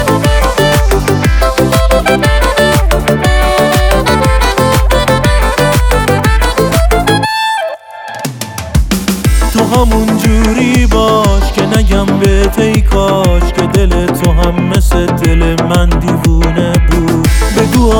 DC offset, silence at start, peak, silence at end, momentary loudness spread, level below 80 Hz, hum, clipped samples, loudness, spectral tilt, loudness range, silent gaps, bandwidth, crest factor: under 0.1%; 0 s; 0 dBFS; 0 s; 3 LU; -14 dBFS; none; under 0.1%; -10 LUFS; -5.5 dB/octave; 3 LU; none; over 20 kHz; 8 dB